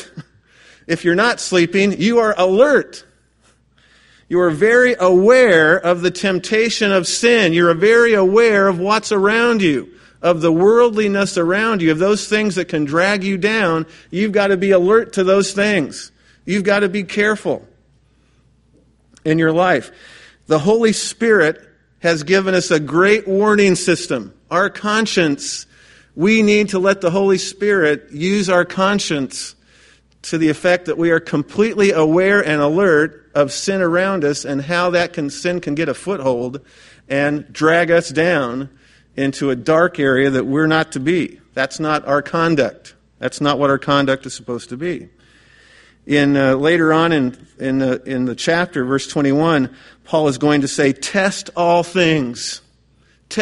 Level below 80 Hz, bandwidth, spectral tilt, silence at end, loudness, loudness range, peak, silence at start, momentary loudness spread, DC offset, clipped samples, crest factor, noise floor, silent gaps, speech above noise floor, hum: -54 dBFS; 11.5 kHz; -5 dB/octave; 0 s; -16 LUFS; 5 LU; 0 dBFS; 0 s; 10 LU; under 0.1%; under 0.1%; 16 dB; -56 dBFS; none; 41 dB; none